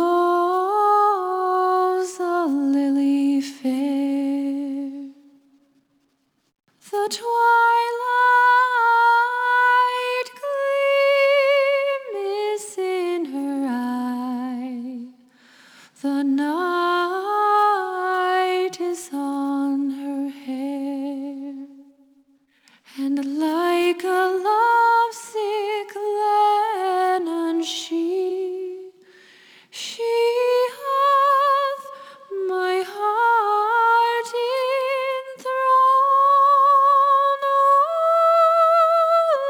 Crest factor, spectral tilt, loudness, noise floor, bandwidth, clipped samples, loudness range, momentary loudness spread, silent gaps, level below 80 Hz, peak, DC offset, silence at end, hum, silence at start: 12 dB; -2.5 dB/octave; -20 LUFS; -68 dBFS; over 20 kHz; under 0.1%; 10 LU; 13 LU; none; -80 dBFS; -8 dBFS; under 0.1%; 0 s; none; 0 s